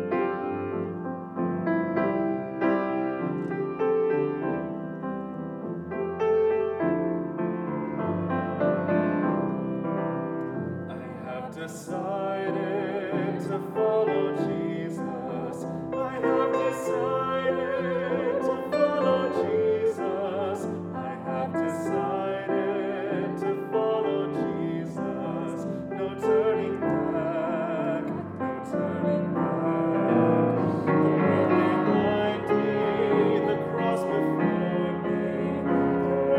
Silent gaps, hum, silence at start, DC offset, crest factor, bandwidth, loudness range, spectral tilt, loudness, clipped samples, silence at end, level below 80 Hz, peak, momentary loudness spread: none; none; 0 s; under 0.1%; 16 dB; 13 kHz; 5 LU; -8 dB/octave; -27 LUFS; under 0.1%; 0 s; -62 dBFS; -10 dBFS; 9 LU